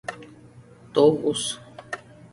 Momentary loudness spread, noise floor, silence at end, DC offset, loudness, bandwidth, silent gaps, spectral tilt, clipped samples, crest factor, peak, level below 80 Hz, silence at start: 18 LU; -49 dBFS; 0.05 s; under 0.1%; -22 LUFS; 11.5 kHz; none; -4.5 dB/octave; under 0.1%; 20 dB; -6 dBFS; -62 dBFS; 0.1 s